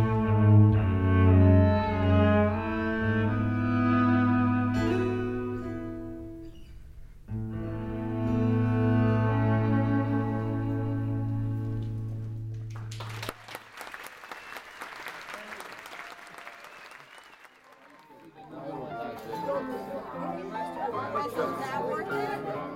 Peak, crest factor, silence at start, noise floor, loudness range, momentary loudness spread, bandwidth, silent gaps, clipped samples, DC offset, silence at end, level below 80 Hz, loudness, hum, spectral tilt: -8 dBFS; 18 dB; 0 s; -55 dBFS; 18 LU; 20 LU; 13 kHz; none; under 0.1%; under 0.1%; 0 s; -46 dBFS; -27 LUFS; none; -8.5 dB/octave